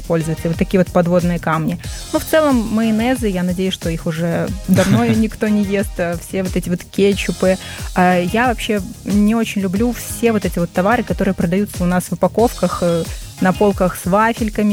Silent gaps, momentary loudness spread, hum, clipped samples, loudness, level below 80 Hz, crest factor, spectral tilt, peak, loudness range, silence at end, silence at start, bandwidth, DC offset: none; 7 LU; none; under 0.1%; -17 LUFS; -32 dBFS; 14 dB; -6 dB/octave; -2 dBFS; 1 LU; 0 s; 0 s; 17.5 kHz; under 0.1%